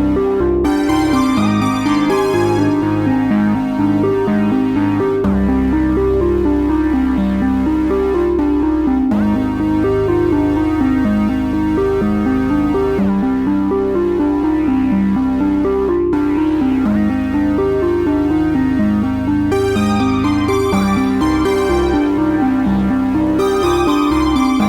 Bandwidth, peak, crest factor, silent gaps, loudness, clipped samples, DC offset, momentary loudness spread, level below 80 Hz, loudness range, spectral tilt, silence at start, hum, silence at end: 14.5 kHz; -2 dBFS; 12 dB; none; -15 LUFS; under 0.1%; under 0.1%; 2 LU; -30 dBFS; 1 LU; -7 dB/octave; 0 s; none; 0 s